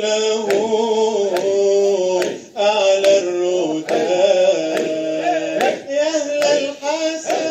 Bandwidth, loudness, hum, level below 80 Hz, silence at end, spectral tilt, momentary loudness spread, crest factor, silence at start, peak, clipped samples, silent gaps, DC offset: 15 kHz; -17 LUFS; none; -74 dBFS; 0 s; -3 dB/octave; 6 LU; 14 dB; 0 s; -2 dBFS; under 0.1%; none; under 0.1%